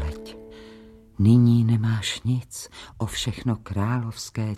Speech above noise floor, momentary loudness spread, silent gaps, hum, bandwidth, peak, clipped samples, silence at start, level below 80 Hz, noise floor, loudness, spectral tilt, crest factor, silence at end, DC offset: 25 dB; 22 LU; none; none; 13.5 kHz; -6 dBFS; under 0.1%; 0 s; -44 dBFS; -47 dBFS; -23 LUFS; -6 dB/octave; 16 dB; 0 s; under 0.1%